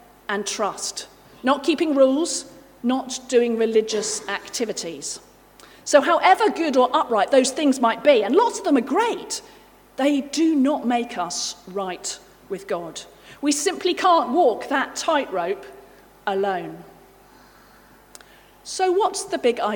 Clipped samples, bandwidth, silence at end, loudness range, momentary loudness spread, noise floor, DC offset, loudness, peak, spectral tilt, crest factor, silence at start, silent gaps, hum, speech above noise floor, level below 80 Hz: under 0.1%; 19 kHz; 0 s; 8 LU; 14 LU; -51 dBFS; under 0.1%; -21 LUFS; -2 dBFS; -2.5 dB/octave; 20 dB; 0.3 s; none; 50 Hz at -60 dBFS; 30 dB; -62 dBFS